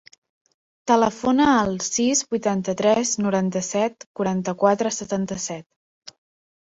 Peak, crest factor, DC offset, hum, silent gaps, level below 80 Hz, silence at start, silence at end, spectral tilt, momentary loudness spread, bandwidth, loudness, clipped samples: -4 dBFS; 18 dB; under 0.1%; none; 4.06-4.15 s; -58 dBFS; 0.85 s; 1.05 s; -4 dB/octave; 9 LU; 8.2 kHz; -22 LUFS; under 0.1%